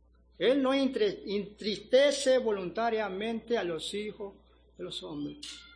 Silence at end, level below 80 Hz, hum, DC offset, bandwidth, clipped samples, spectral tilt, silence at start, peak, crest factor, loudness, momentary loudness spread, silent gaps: 0.1 s; -62 dBFS; none; under 0.1%; 10.5 kHz; under 0.1%; -4 dB/octave; 0.4 s; -12 dBFS; 18 dB; -30 LUFS; 15 LU; none